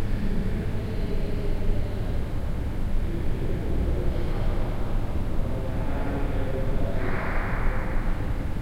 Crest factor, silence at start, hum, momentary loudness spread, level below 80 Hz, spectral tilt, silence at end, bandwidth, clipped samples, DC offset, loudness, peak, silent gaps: 12 dB; 0 s; none; 2 LU; -26 dBFS; -8 dB/octave; 0 s; 5.4 kHz; under 0.1%; under 0.1%; -30 LUFS; -10 dBFS; none